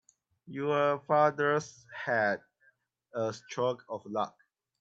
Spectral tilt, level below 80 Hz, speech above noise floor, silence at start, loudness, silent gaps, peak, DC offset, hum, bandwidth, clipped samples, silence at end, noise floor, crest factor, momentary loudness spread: -5.5 dB/octave; -80 dBFS; 39 dB; 0.45 s; -31 LUFS; none; -12 dBFS; under 0.1%; none; 7.8 kHz; under 0.1%; 0.5 s; -70 dBFS; 20 dB; 13 LU